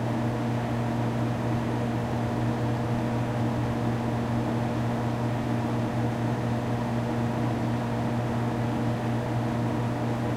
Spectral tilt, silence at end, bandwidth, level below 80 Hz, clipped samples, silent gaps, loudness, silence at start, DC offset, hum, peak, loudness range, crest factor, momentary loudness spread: -7.5 dB/octave; 0 s; 13 kHz; -48 dBFS; under 0.1%; none; -28 LUFS; 0 s; under 0.1%; none; -14 dBFS; 0 LU; 12 dB; 1 LU